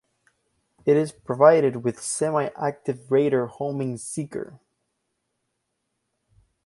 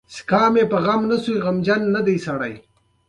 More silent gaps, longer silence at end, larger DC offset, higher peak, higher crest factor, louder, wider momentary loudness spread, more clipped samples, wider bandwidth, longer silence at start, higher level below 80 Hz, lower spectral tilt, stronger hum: neither; first, 2.2 s vs 0.5 s; neither; about the same, -2 dBFS vs -4 dBFS; first, 22 dB vs 16 dB; second, -23 LUFS vs -19 LUFS; first, 14 LU vs 8 LU; neither; about the same, 11.5 kHz vs 11 kHz; first, 0.85 s vs 0.1 s; second, -68 dBFS vs -56 dBFS; about the same, -6 dB/octave vs -6.5 dB/octave; neither